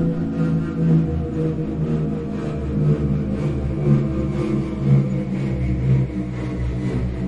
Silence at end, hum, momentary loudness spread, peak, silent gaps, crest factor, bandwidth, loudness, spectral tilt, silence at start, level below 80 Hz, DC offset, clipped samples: 0 s; none; 6 LU; -6 dBFS; none; 16 dB; 7.8 kHz; -21 LUFS; -10 dB/octave; 0 s; -32 dBFS; under 0.1%; under 0.1%